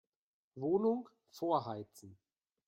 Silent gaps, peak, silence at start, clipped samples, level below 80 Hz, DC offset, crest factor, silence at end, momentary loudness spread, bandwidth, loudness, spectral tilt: none; -20 dBFS; 0.55 s; under 0.1%; -82 dBFS; under 0.1%; 20 dB; 0.55 s; 21 LU; 16.5 kHz; -37 LUFS; -7.5 dB/octave